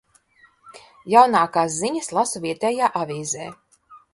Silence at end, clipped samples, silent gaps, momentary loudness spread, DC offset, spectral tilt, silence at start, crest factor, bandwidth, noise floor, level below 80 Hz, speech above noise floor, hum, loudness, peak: 0.15 s; under 0.1%; none; 13 LU; under 0.1%; -3.5 dB/octave; 0.65 s; 22 dB; 11.5 kHz; -57 dBFS; -66 dBFS; 37 dB; none; -20 LUFS; 0 dBFS